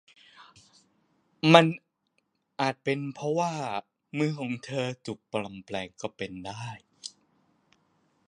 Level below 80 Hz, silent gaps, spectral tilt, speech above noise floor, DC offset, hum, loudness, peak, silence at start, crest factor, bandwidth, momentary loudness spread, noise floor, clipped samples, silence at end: -70 dBFS; none; -5.5 dB/octave; 48 dB; under 0.1%; none; -28 LUFS; 0 dBFS; 0.4 s; 30 dB; 11 kHz; 22 LU; -76 dBFS; under 0.1%; 1.2 s